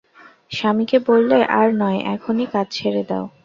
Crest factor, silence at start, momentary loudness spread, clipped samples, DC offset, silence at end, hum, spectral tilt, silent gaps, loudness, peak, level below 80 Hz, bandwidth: 16 dB; 0.5 s; 8 LU; under 0.1%; under 0.1%; 0.15 s; none; -6.5 dB/octave; none; -18 LUFS; -2 dBFS; -62 dBFS; 7.4 kHz